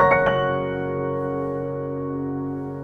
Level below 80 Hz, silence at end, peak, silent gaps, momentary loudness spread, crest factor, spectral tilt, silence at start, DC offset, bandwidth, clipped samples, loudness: -48 dBFS; 0 s; -4 dBFS; none; 9 LU; 18 dB; -8.5 dB/octave; 0 s; under 0.1%; 6 kHz; under 0.1%; -24 LUFS